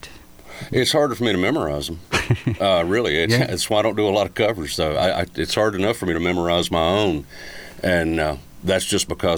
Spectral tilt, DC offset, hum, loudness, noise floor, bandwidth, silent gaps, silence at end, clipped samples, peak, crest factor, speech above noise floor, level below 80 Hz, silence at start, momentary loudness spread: -4.5 dB/octave; 0.3%; none; -20 LUFS; -42 dBFS; over 20 kHz; none; 0 s; under 0.1%; -6 dBFS; 16 dB; 22 dB; -42 dBFS; 0.05 s; 7 LU